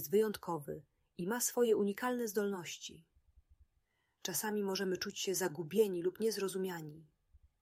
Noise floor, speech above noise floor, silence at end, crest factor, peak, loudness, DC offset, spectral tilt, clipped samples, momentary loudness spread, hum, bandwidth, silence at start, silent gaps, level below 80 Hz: -80 dBFS; 44 dB; 0.25 s; 18 dB; -18 dBFS; -37 LUFS; under 0.1%; -4 dB/octave; under 0.1%; 14 LU; none; 16 kHz; 0 s; none; -74 dBFS